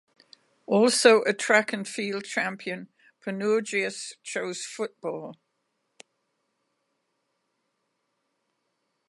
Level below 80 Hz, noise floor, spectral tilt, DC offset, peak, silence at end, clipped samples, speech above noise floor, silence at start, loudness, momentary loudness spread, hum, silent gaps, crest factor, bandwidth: -84 dBFS; -77 dBFS; -3 dB/octave; under 0.1%; -4 dBFS; 3.75 s; under 0.1%; 52 dB; 0.7 s; -25 LUFS; 17 LU; none; none; 26 dB; 11.5 kHz